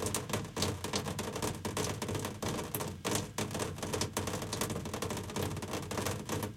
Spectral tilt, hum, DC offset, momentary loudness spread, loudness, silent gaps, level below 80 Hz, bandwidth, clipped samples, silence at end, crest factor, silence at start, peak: -4 dB/octave; none; under 0.1%; 3 LU; -37 LUFS; none; -58 dBFS; 17 kHz; under 0.1%; 0 s; 22 dB; 0 s; -14 dBFS